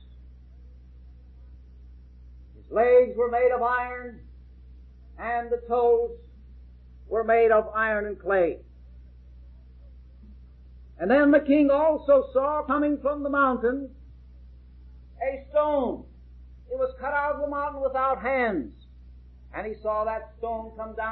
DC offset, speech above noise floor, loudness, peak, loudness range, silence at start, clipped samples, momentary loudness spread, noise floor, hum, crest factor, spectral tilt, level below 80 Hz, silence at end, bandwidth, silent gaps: under 0.1%; 24 dB; -25 LUFS; -8 dBFS; 7 LU; 0.1 s; under 0.1%; 15 LU; -48 dBFS; none; 18 dB; -10 dB/octave; -48 dBFS; 0 s; 4.4 kHz; none